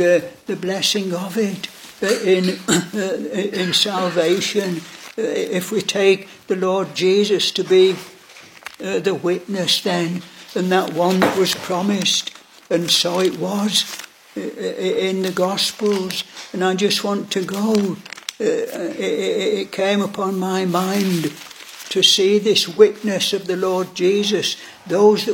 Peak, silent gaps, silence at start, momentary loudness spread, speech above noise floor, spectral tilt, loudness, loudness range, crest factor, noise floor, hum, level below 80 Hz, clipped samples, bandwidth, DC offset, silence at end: 0 dBFS; none; 0 s; 12 LU; 24 dB; -4 dB/octave; -19 LUFS; 4 LU; 20 dB; -43 dBFS; none; -66 dBFS; under 0.1%; 17 kHz; under 0.1%; 0 s